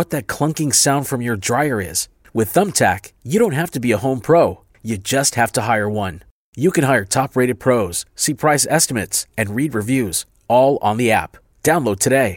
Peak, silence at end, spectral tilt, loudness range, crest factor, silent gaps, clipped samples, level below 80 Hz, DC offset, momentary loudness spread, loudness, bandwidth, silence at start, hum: -2 dBFS; 0 s; -4 dB/octave; 1 LU; 16 dB; 6.31-6.53 s; under 0.1%; -50 dBFS; under 0.1%; 8 LU; -18 LUFS; 17 kHz; 0 s; none